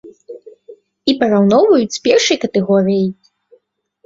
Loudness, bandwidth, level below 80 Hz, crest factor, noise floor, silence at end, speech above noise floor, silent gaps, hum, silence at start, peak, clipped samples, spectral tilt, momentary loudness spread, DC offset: -14 LUFS; 7.8 kHz; -56 dBFS; 16 dB; -58 dBFS; 0.95 s; 45 dB; none; none; 0.05 s; 0 dBFS; under 0.1%; -5 dB/octave; 7 LU; under 0.1%